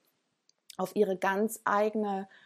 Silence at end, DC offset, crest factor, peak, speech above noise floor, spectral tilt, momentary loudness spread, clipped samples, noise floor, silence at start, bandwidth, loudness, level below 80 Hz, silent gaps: 0.2 s; under 0.1%; 18 dB; -14 dBFS; 44 dB; -5 dB/octave; 8 LU; under 0.1%; -74 dBFS; 0.8 s; 15 kHz; -30 LUFS; -84 dBFS; none